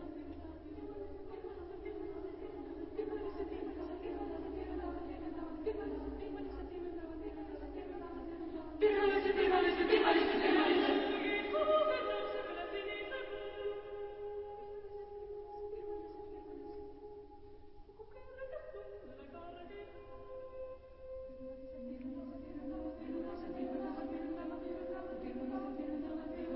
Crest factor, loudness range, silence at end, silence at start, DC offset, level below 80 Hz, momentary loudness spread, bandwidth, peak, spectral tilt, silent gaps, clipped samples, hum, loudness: 22 dB; 18 LU; 0 s; 0 s; under 0.1%; -58 dBFS; 19 LU; 5.6 kHz; -18 dBFS; -2.5 dB/octave; none; under 0.1%; none; -39 LUFS